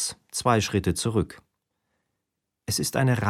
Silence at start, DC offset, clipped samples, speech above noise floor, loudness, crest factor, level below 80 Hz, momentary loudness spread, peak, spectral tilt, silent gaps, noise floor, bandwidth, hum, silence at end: 0 s; under 0.1%; under 0.1%; 59 dB; -25 LUFS; 20 dB; -50 dBFS; 8 LU; -8 dBFS; -4.5 dB/octave; none; -83 dBFS; 16 kHz; none; 0 s